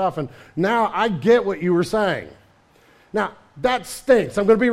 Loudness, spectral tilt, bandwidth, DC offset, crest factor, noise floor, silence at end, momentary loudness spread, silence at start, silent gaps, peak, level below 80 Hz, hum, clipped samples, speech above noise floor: -20 LUFS; -6 dB/octave; 15.5 kHz; under 0.1%; 18 dB; -54 dBFS; 0 s; 11 LU; 0 s; none; -4 dBFS; -52 dBFS; none; under 0.1%; 35 dB